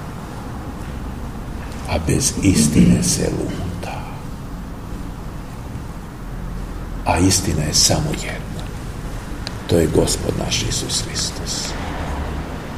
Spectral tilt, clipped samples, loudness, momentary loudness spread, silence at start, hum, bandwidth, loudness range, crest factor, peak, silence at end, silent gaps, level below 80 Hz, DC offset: -4 dB/octave; under 0.1%; -20 LUFS; 17 LU; 0 s; none; 15.5 kHz; 9 LU; 20 dB; 0 dBFS; 0 s; none; -30 dBFS; 0.6%